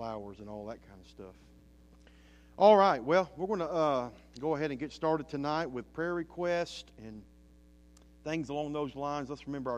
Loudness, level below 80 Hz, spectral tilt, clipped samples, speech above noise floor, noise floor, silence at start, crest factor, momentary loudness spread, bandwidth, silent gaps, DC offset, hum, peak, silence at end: -31 LUFS; -60 dBFS; -6 dB/octave; under 0.1%; 27 dB; -59 dBFS; 0 s; 22 dB; 23 LU; 9.6 kHz; none; under 0.1%; none; -10 dBFS; 0 s